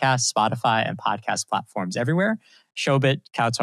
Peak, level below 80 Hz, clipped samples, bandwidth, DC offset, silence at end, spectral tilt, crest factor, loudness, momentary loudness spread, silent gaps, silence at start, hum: -8 dBFS; -72 dBFS; under 0.1%; 13.5 kHz; under 0.1%; 0 s; -4 dB/octave; 16 dB; -23 LUFS; 7 LU; none; 0 s; none